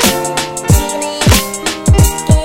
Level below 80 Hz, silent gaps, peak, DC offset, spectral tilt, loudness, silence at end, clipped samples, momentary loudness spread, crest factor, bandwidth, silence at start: -18 dBFS; none; 0 dBFS; under 0.1%; -4 dB/octave; -12 LUFS; 0 s; under 0.1%; 6 LU; 12 dB; 18 kHz; 0 s